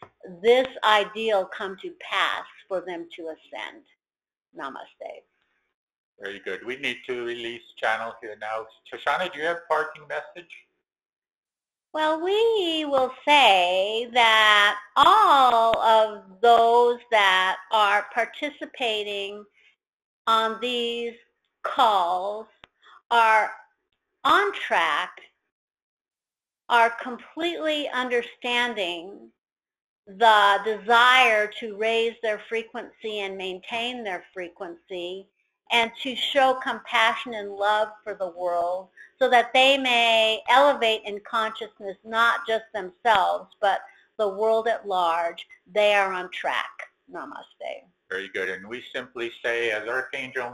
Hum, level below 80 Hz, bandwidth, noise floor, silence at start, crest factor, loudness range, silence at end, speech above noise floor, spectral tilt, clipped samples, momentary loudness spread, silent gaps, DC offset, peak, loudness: none; -68 dBFS; 13.5 kHz; under -90 dBFS; 0 s; 24 dB; 13 LU; 0 s; over 67 dB; -2 dB/octave; under 0.1%; 19 LU; 5.74-5.87 s, 5.98-6.13 s, 11.35-11.43 s, 19.89-20.25 s, 23.06-23.10 s, 25.52-25.68 s, 25.82-26.05 s, 29.81-30.03 s; under 0.1%; -2 dBFS; -22 LUFS